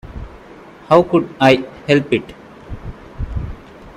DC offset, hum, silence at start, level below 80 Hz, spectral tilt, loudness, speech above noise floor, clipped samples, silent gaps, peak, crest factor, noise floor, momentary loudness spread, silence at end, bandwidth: under 0.1%; none; 0.05 s; -34 dBFS; -6.5 dB/octave; -16 LUFS; 26 dB; under 0.1%; none; 0 dBFS; 18 dB; -40 dBFS; 22 LU; 0.05 s; 13 kHz